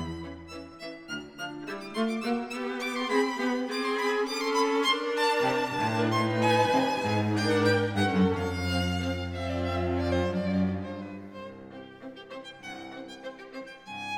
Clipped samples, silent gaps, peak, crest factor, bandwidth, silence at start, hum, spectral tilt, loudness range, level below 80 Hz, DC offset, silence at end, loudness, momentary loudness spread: under 0.1%; none; -12 dBFS; 18 dB; 17 kHz; 0 s; none; -5.5 dB/octave; 8 LU; -60 dBFS; under 0.1%; 0 s; -28 LUFS; 18 LU